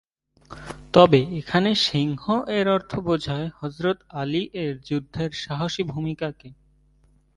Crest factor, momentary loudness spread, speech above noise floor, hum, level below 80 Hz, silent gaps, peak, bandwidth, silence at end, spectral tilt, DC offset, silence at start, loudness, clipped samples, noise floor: 24 dB; 13 LU; 37 dB; none; -52 dBFS; none; 0 dBFS; 11.5 kHz; 0.85 s; -6 dB/octave; under 0.1%; 0.5 s; -23 LUFS; under 0.1%; -60 dBFS